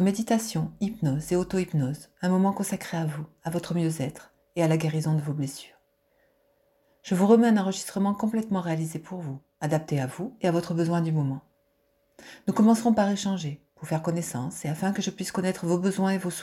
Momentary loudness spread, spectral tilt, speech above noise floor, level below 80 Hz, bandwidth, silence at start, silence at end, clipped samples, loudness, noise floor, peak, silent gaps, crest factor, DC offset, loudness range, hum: 12 LU; -6.5 dB/octave; 43 dB; -62 dBFS; 15.5 kHz; 0 s; 0 s; under 0.1%; -27 LUFS; -69 dBFS; -8 dBFS; none; 18 dB; under 0.1%; 4 LU; none